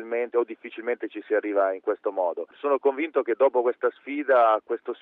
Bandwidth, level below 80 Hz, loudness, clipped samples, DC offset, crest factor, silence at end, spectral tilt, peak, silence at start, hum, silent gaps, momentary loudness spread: 4 kHz; -84 dBFS; -25 LUFS; under 0.1%; under 0.1%; 16 dB; 0.1 s; -6.5 dB/octave; -8 dBFS; 0 s; none; none; 10 LU